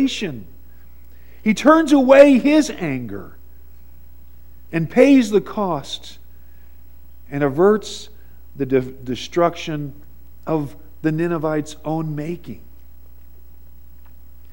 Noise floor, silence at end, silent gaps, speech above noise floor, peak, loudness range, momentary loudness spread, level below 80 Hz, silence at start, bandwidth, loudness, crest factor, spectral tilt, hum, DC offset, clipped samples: -46 dBFS; 1.95 s; none; 28 dB; 0 dBFS; 9 LU; 20 LU; -46 dBFS; 0 s; 16.5 kHz; -18 LUFS; 20 dB; -6 dB/octave; none; 1%; under 0.1%